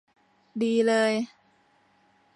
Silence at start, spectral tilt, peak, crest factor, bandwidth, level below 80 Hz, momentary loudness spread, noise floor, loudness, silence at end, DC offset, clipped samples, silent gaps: 0.55 s; -4.5 dB/octave; -12 dBFS; 16 dB; 11 kHz; -82 dBFS; 16 LU; -64 dBFS; -25 LUFS; 1.1 s; under 0.1%; under 0.1%; none